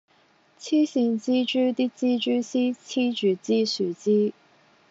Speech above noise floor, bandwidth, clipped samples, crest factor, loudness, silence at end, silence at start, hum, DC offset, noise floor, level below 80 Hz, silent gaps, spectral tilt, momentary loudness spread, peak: 38 dB; 7.8 kHz; under 0.1%; 12 dB; -24 LUFS; 0.6 s; 0.6 s; none; under 0.1%; -61 dBFS; -84 dBFS; none; -4.5 dB/octave; 4 LU; -12 dBFS